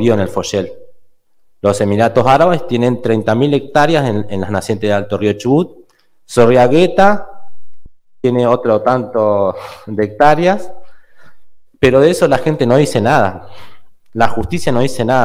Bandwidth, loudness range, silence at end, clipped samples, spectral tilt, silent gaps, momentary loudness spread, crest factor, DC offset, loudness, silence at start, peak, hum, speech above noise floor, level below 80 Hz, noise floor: 16 kHz; 2 LU; 0 s; under 0.1%; -6.5 dB/octave; none; 9 LU; 14 dB; under 0.1%; -13 LUFS; 0 s; 0 dBFS; none; 37 dB; -42 dBFS; -49 dBFS